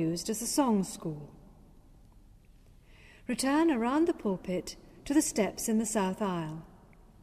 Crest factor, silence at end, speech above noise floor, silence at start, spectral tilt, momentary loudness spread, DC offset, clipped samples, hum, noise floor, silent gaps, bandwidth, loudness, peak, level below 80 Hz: 16 dB; 0.45 s; 27 dB; 0 s; -4.5 dB/octave; 18 LU; under 0.1%; under 0.1%; none; -57 dBFS; none; 15.5 kHz; -30 LUFS; -16 dBFS; -58 dBFS